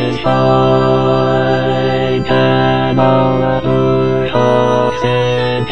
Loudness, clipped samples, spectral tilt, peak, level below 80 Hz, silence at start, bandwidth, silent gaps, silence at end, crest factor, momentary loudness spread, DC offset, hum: -12 LUFS; under 0.1%; -7.5 dB/octave; 0 dBFS; -36 dBFS; 0 s; 7.4 kHz; none; 0 s; 12 dB; 3 LU; 3%; none